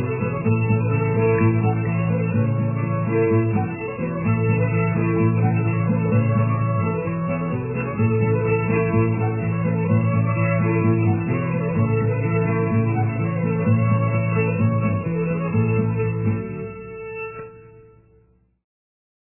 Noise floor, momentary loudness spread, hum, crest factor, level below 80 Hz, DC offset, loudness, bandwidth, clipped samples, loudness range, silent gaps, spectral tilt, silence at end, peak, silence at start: -58 dBFS; 6 LU; none; 14 dB; -46 dBFS; under 0.1%; -21 LUFS; 2.9 kHz; under 0.1%; 3 LU; none; -13.5 dB/octave; 1.45 s; -6 dBFS; 0 s